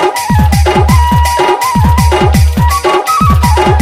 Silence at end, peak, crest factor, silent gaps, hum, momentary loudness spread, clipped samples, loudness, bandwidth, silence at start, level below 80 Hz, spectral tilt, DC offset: 0 s; 0 dBFS; 8 dB; none; none; 2 LU; 0.4%; -9 LUFS; 16 kHz; 0 s; -14 dBFS; -5.5 dB/octave; under 0.1%